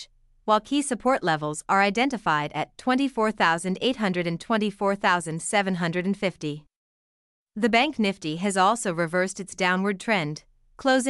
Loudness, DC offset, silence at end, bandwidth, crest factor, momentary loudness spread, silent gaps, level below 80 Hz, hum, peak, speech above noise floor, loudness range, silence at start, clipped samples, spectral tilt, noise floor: -24 LUFS; under 0.1%; 0 s; 12 kHz; 18 dB; 7 LU; 6.76-7.47 s; -60 dBFS; none; -6 dBFS; over 66 dB; 2 LU; 0 s; under 0.1%; -4.5 dB/octave; under -90 dBFS